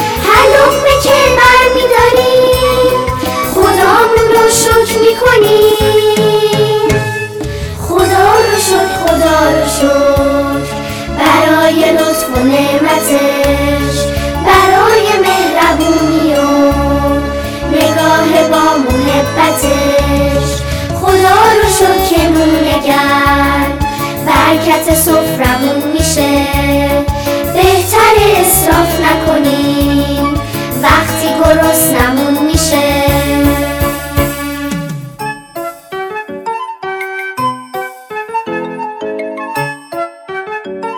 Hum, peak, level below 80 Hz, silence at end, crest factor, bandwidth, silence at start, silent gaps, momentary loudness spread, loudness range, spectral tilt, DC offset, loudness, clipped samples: none; 0 dBFS; -24 dBFS; 0 s; 10 dB; 19 kHz; 0 s; none; 13 LU; 11 LU; -4 dB/octave; under 0.1%; -10 LUFS; under 0.1%